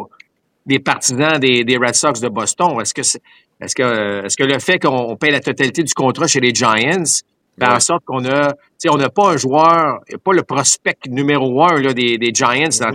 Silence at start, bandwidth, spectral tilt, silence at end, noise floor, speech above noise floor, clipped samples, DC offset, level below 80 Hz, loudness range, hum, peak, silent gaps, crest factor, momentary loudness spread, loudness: 0 s; 16 kHz; -3 dB/octave; 0 s; -50 dBFS; 35 dB; under 0.1%; under 0.1%; -60 dBFS; 2 LU; none; 0 dBFS; none; 16 dB; 6 LU; -14 LUFS